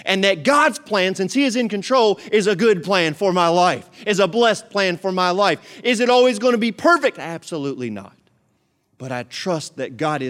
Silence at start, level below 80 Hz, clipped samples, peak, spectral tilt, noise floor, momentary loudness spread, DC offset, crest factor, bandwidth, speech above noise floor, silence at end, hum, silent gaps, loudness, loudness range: 0.05 s; -70 dBFS; under 0.1%; 0 dBFS; -4 dB/octave; -66 dBFS; 12 LU; under 0.1%; 18 dB; 15.5 kHz; 47 dB; 0 s; none; none; -18 LUFS; 5 LU